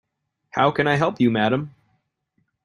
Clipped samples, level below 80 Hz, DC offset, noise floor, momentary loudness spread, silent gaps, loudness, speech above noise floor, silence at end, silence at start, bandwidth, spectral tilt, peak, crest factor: under 0.1%; -60 dBFS; under 0.1%; -71 dBFS; 10 LU; none; -21 LUFS; 51 dB; 0.95 s; 0.55 s; 10.5 kHz; -7 dB/octave; -4 dBFS; 20 dB